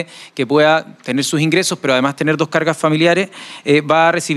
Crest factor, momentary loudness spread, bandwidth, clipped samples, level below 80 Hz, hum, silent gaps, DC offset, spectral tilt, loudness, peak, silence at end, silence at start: 14 dB; 9 LU; 14.5 kHz; under 0.1%; -60 dBFS; none; none; under 0.1%; -4.5 dB/octave; -15 LUFS; 0 dBFS; 0 s; 0 s